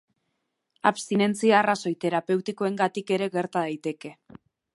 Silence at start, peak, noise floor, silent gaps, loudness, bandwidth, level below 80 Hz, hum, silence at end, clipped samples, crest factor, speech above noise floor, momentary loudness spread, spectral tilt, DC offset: 0.85 s; -6 dBFS; -78 dBFS; none; -25 LUFS; 11.5 kHz; -76 dBFS; none; 0.6 s; under 0.1%; 22 dB; 53 dB; 11 LU; -5 dB/octave; under 0.1%